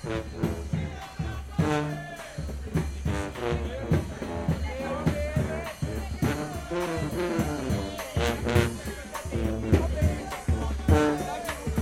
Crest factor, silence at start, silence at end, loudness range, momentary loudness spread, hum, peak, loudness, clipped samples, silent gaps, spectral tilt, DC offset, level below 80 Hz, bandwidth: 22 dB; 0 s; 0 s; 4 LU; 9 LU; none; -6 dBFS; -29 LUFS; under 0.1%; none; -6.5 dB/octave; under 0.1%; -38 dBFS; 16.5 kHz